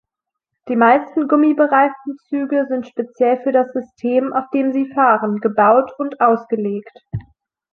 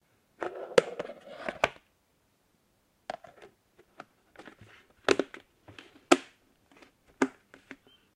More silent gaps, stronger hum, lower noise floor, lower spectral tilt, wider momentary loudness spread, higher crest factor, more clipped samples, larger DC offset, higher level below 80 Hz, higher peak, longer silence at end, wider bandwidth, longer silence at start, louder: neither; neither; first, -82 dBFS vs -71 dBFS; first, -9 dB/octave vs -3.5 dB/octave; second, 12 LU vs 26 LU; second, 16 dB vs 34 dB; neither; neither; first, -56 dBFS vs -70 dBFS; about the same, -2 dBFS vs -2 dBFS; about the same, 0.5 s vs 0.4 s; second, 4.4 kHz vs 14.5 kHz; first, 0.65 s vs 0.4 s; first, -17 LUFS vs -31 LUFS